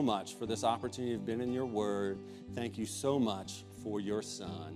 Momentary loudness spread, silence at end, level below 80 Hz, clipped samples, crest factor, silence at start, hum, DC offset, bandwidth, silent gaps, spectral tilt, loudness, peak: 9 LU; 0 s; -68 dBFS; under 0.1%; 18 dB; 0 s; none; under 0.1%; 15 kHz; none; -5 dB/octave; -37 LUFS; -18 dBFS